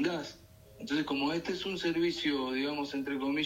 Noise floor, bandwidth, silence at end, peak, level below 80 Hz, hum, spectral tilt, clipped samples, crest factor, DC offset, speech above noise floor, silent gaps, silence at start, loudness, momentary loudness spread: -55 dBFS; 16 kHz; 0 s; -18 dBFS; -64 dBFS; none; -4.5 dB/octave; under 0.1%; 14 dB; under 0.1%; 22 dB; none; 0 s; -33 LUFS; 6 LU